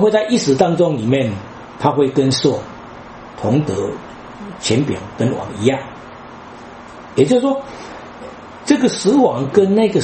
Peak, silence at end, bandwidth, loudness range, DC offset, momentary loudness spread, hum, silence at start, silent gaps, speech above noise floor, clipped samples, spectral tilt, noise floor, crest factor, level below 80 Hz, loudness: 0 dBFS; 0 s; 8.8 kHz; 5 LU; under 0.1%; 21 LU; none; 0 s; none; 20 dB; under 0.1%; -6 dB/octave; -35 dBFS; 18 dB; -50 dBFS; -16 LUFS